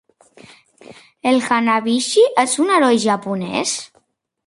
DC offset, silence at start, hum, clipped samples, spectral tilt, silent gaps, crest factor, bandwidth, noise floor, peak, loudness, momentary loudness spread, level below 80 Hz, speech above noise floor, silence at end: under 0.1%; 0.9 s; none; under 0.1%; -3.5 dB/octave; none; 16 dB; 11.5 kHz; -61 dBFS; -2 dBFS; -17 LUFS; 8 LU; -66 dBFS; 45 dB; 0.6 s